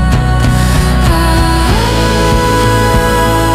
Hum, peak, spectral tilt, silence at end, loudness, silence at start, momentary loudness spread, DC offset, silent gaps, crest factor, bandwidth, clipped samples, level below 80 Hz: none; 0 dBFS; -5.5 dB/octave; 0 s; -10 LUFS; 0 s; 1 LU; under 0.1%; none; 8 dB; 15.5 kHz; under 0.1%; -14 dBFS